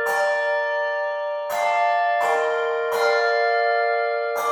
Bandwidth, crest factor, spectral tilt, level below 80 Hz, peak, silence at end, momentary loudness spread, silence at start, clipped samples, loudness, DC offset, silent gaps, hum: 17.5 kHz; 12 dB; -0.5 dB/octave; -78 dBFS; -8 dBFS; 0 s; 5 LU; 0 s; under 0.1%; -21 LUFS; under 0.1%; none; none